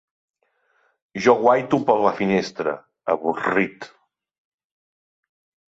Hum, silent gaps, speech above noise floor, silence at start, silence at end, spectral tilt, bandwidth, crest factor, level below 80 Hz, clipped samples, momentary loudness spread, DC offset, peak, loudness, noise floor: none; none; 47 dB; 1.15 s; 1.8 s; -6 dB/octave; 7.8 kHz; 20 dB; -64 dBFS; under 0.1%; 13 LU; under 0.1%; -2 dBFS; -21 LUFS; -66 dBFS